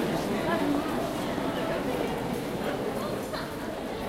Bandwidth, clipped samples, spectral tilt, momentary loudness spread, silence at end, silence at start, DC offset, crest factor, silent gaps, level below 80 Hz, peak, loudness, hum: 16 kHz; under 0.1%; -5.5 dB/octave; 6 LU; 0 s; 0 s; under 0.1%; 16 dB; none; -50 dBFS; -14 dBFS; -30 LUFS; none